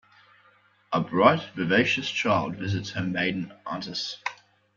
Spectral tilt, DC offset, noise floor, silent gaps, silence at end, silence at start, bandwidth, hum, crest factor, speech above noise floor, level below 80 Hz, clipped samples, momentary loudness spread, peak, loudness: -5.5 dB/octave; under 0.1%; -61 dBFS; none; 0.4 s; 0.9 s; 7.4 kHz; none; 24 dB; 35 dB; -64 dBFS; under 0.1%; 13 LU; -4 dBFS; -26 LUFS